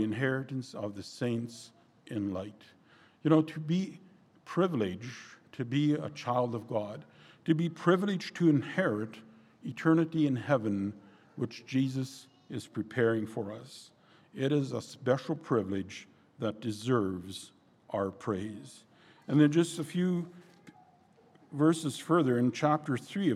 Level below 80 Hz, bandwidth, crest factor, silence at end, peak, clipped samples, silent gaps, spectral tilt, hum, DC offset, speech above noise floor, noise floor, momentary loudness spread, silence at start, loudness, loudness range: -76 dBFS; 13 kHz; 20 dB; 0 s; -12 dBFS; under 0.1%; none; -7 dB/octave; none; under 0.1%; 32 dB; -63 dBFS; 17 LU; 0 s; -31 LUFS; 4 LU